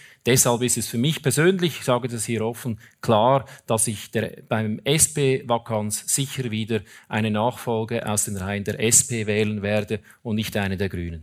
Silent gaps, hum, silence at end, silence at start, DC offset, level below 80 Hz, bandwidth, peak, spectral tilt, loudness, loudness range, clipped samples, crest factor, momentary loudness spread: none; none; 0 s; 0.05 s; under 0.1%; -54 dBFS; 16.5 kHz; -2 dBFS; -4 dB/octave; -22 LUFS; 2 LU; under 0.1%; 20 dB; 10 LU